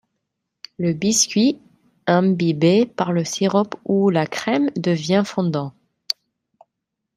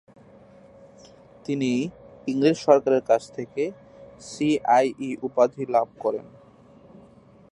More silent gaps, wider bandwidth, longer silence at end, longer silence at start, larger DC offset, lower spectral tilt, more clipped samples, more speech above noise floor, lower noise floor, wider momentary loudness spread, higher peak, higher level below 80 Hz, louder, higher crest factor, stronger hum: neither; first, 15 kHz vs 11 kHz; second, 1.05 s vs 1.25 s; second, 0.8 s vs 1.5 s; neither; about the same, -5 dB/octave vs -6 dB/octave; neither; first, 61 dB vs 29 dB; first, -80 dBFS vs -52 dBFS; second, 10 LU vs 15 LU; about the same, -2 dBFS vs -4 dBFS; about the same, -64 dBFS vs -66 dBFS; first, -20 LUFS vs -24 LUFS; about the same, 18 dB vs 22 dB; neither